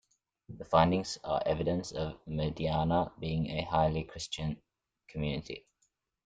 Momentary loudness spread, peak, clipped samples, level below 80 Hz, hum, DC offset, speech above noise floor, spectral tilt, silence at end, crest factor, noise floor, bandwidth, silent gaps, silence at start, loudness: 17 LU; -10 dBFS; under 0.1%; -52 dBFS; none; under 0.1%; 46 dB; -6 dB/octave; 0.65 s; 22 dB; -78 dBFS; 9.2 kHz; none; 0.5 s; -32 LUFS